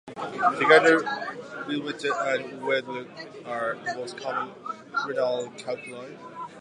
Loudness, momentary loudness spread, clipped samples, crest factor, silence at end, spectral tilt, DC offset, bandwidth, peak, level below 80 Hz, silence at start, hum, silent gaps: -26 LUFS; 21 LU; under 0.1%; 24 dB; 0 s; -4 dB/octave; under 0.1%; 10.5 kHz; -4 dBFS; -78 dBFS; 0.05 s; none; none